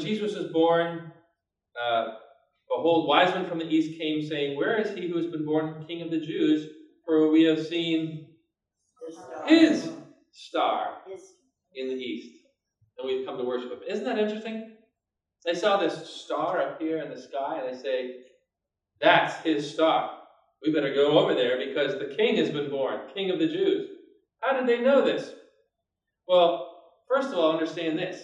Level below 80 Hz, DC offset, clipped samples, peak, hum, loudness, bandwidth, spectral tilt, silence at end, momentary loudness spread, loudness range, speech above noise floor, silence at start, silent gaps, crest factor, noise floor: -82 dBFS; under 0.1%; under 0.1%; -6 dBFS; none; -26 LUFS; 9.8 kHz; -5.5 dB/octave; 0 s; 16 LU; 8 LU; 60 dB; 0 s; none; 22 dB; -86 dBFS